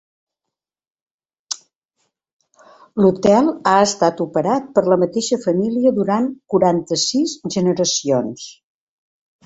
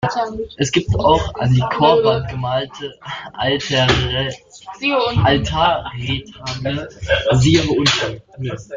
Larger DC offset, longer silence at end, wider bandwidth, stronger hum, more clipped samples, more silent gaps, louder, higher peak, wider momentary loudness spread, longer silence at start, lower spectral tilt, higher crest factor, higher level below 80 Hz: neither; first, 0.95 s vs 0 s; about the same, 8.2 kHz vs 7.6 kHz; neither; neither; first, 1.76-1.81 s, 2.33-2.39 s vs none; about the same, -17 LUFS vs -17 LUFS; about the same, -2 dBFS vs -2 dBFS; about the same, 14 LU vs 14 LU; first, 1.5 s vs 0 s; about the same, -4.5 dB/octave vs -5 dB/octave; about the same, 18 dB vs 16 dB; second, -58 dBFS vs -36 dBFS